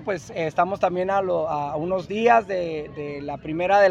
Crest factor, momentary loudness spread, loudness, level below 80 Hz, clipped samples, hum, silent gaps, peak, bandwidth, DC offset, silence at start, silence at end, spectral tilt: 18 dB; 13 LU; -23 LUFS; -54 dBFS; under 0.1%; none; none; -4 dBFS; 8.2 kHz; under 0.1%; 0 s; 0 s; -6 dB/octave